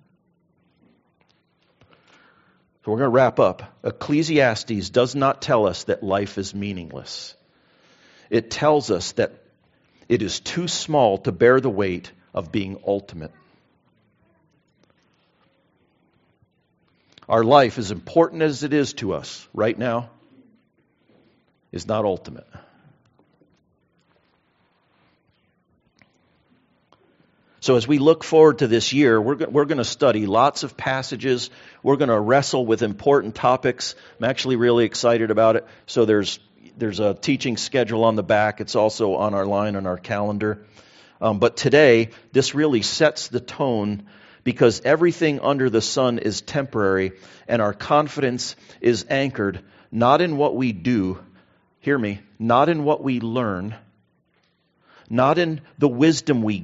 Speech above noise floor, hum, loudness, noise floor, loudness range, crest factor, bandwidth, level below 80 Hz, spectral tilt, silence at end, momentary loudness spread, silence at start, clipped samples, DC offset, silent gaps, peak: 46 dB; none; -20 LUFS; -66 dBFS; 9 LU; 22 dB; 8 kHz; -60 dBFS; -4.5 dB/octave; 0 s; 12 LU; 2.85 s; under 0.1%; under 0.1%; none; 0 dBFS